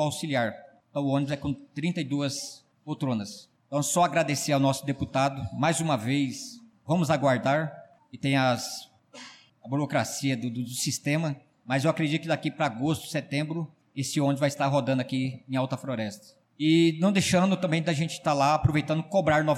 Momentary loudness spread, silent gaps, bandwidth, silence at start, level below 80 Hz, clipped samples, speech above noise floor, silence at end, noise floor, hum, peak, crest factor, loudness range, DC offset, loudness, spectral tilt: 13 LU; none; 16 kHz; 0 s; -58 dBFS; under 0.1%; 22 dB; 0 s; -49 dBFS; none; -12 dBFS; 16 dB; 5 LU; under 0.1%; -27 LUFS; -5 dB/octave